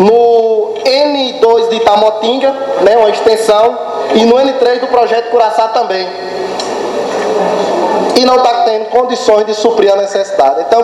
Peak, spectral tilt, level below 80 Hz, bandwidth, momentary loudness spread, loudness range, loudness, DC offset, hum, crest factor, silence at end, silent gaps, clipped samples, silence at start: 0 dBFS; -4 dB/octave; -52 dBFS; 12.5 kHz; 7 LU; 3 LU; -10 LUFS; under 0.1%; none; 10 dB; 0 s; none; 0.5%; 0 s